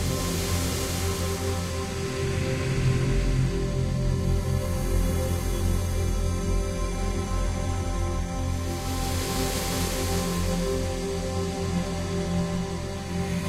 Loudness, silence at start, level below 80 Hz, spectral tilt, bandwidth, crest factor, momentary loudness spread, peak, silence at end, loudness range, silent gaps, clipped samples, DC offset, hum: -28 LUFS; 0 s; -32 dBFS; -5 dB/octave; 16 kHz; 14 dB; 4 LU; -12 dBFS; 0 s; 2 LU; none; under 0.1%; under 0.1%; none